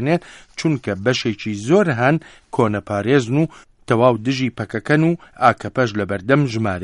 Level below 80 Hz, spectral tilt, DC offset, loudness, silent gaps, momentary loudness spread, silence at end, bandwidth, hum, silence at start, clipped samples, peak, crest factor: -52 dBFS; -6.5 dB/octave; under 0.1%; -19 LUFS; none; 7 LU; 0 s; 11.5 kHz; none; 0 s; under 0.1%; 0 dBFS; 18 dB